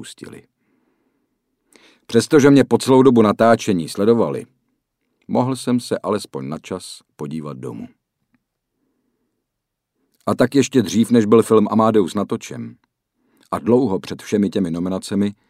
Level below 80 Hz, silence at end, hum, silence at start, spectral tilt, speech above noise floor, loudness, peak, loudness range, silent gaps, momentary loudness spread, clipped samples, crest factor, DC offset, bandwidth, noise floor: -58 dBFS; 0.2 s; none; 0 s; -6 dB/octave; 62 dB; -17 LUFS; -2 dBFS; 16 LU; none; 18 LU; under 0.1%; 18 dB; under 0.1%; 15 kHz; -79 dBFS